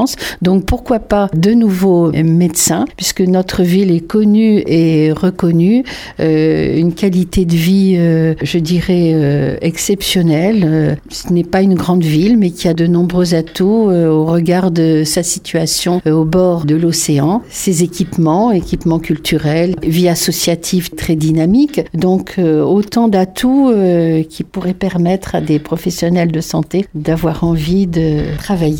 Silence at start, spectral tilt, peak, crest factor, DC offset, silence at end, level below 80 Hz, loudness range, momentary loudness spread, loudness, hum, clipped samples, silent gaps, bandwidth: 0 s; -6 dB/octave; 0 dBFS; 12 dB; under 0.1%; 0 s; -34 dBFS; 2 LU; 5 LU; -13 LUFS; none; under 0.1%; none; 17.5 kHz